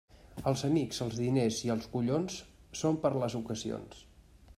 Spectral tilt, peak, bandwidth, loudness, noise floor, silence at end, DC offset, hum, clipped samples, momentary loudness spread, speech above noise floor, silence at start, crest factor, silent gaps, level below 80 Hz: -6 dB/octave; -16 dBFS; 14.5 kHz; -33 LUFS; -57 dBFS; 0.55 s; under 0.1%; none; under 0.1%; 13 LU; 25 dB; 0.15 s; 18 dB; none; -60 dBFS